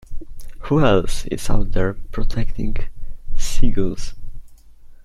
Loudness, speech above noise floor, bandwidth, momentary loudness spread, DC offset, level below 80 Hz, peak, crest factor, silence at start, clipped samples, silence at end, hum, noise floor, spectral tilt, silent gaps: -23 LUFS; 26 dB; 11 kHz; 23 LU; under 0.1%; -22 dBFS; -2 dBFS; 14 dB; 0.1 s; under 0.1%; 0.1 s; none; -40 dBFS; -6 dB/octave; none